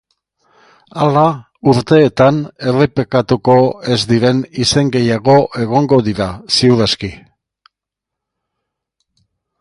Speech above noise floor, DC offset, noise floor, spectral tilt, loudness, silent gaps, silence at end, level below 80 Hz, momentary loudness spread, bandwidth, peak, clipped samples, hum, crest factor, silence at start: 70 dB; under 0.1%; -82 dBFS; -6 dB/octave; -13 LUFS; none; 2.45 s; -44 dBFS; 7 LU; 11.5 kHz; 0 dBFS; under 0.1%; none; 14 dB; 0.95 s